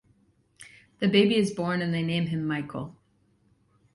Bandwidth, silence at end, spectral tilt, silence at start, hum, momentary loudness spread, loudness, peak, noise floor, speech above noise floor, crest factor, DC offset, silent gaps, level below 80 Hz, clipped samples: 11.5 kHz; 1 s; -6.5 dB/octave; 0.6 s; none; 15 LU; -26 LUFS; -8 dBFS; -66 dBFS; 41 dB; 20 dB; under 0.1%; none; -64 dBFS; under 0.1%